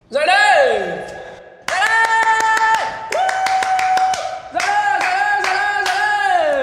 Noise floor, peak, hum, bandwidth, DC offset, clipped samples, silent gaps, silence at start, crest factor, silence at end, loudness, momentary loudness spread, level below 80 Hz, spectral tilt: -36 dBFS; -2 dBFS; none; 16 kHz; under 0.1%; under 0.1%; none; 0.1 s; 14 dB; 0 s; -16 LUFS; 10 LU; -56 dBFS; -1 dB/octave